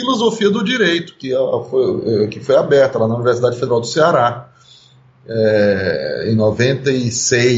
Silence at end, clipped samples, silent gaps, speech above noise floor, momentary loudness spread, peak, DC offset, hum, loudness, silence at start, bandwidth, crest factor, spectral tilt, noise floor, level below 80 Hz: 0 s; under 0.1%; none; 33 dB; 6 LU; -2 dBFS; under 0.1%; none; -15 LUFS; 0 s; 8 kHz; 14 dB; -4.5 dB/octave; -47 dBFS; -54 dBFS